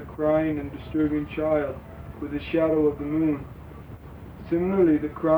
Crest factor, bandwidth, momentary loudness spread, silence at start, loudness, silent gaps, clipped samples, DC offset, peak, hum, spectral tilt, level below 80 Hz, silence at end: 14 dB; over 20 kHz; 21 LU; 0 s; -25 LUFS; none; under 0.1%; under 0.1%; -10 dBFS; none; -9.5 dB/octave; -46 dBFS; 0 s